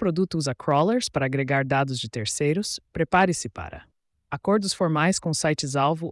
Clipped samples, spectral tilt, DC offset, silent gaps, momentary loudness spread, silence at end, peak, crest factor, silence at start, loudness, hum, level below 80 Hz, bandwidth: under 0.1%; -4.5 dB/octave; under 0.1%; none; 9 LU; 0 s; -8 dBFS; 16 dB; 0 s; -24 LUFS; none; -54 dBFS; 12 kHz